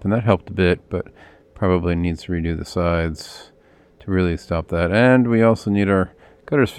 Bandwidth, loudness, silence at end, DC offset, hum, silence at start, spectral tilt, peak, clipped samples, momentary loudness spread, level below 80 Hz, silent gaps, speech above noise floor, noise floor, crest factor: 13 kHz; -20 LUFS; 0 s; under 0.1%; none; 0 s; -7.5 dB/octave; -2 dBFS; under 0.1%; 14 LU; -42 dBFS; none; 32 dB; -51 dBFS; 18 dB